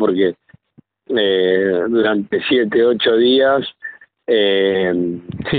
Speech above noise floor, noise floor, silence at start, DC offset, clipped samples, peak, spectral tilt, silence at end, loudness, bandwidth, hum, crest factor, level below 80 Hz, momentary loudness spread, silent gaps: 38 dB; -53 dBFS; 0 s; under 0.1%; under 0.1%; -4 dBFS; -3 dB/octave; 0 s; -16 LUFS; 4.7 kHz; none; 12 dB; -54 dBFS; 12 LU; none